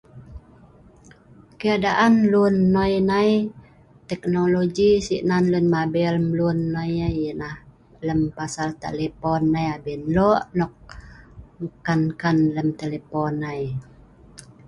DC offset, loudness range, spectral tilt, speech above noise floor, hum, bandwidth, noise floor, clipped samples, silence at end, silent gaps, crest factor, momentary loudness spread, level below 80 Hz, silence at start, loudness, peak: under 0.1%; 5 LU; -7 dB/octave; 29 dB; none; 11.5 kHz; -50 dBFS; under 0.1%; 0.25 s; none; 16 dB; 12 LU; -46 dBFS; 0.15 s; -22 LUFS; -6 dBFS